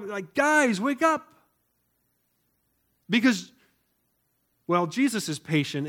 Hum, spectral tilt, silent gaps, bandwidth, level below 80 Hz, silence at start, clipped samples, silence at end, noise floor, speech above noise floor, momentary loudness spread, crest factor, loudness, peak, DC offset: none; -4.5 dB/octave; none; 17 kHz; -76 dBFS; 0 s; under 0.1%; 0 s; -73 dBFS; 48 dB; 9 LU; 20 dB; -25 LUFS; -8 dBFS; under 0.1%